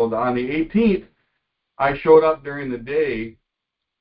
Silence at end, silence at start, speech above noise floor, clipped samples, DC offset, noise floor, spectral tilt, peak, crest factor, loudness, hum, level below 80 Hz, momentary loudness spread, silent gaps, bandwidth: 0.7 s; 0 s; 63 dB; under 0.1%; under 0.1%; -82 dBFS; -11.5 dB/octave; -2 dBFS; 18 dB; -20 LUFS; none; -48 dBFS; 14 LU; none; 5.2 kHz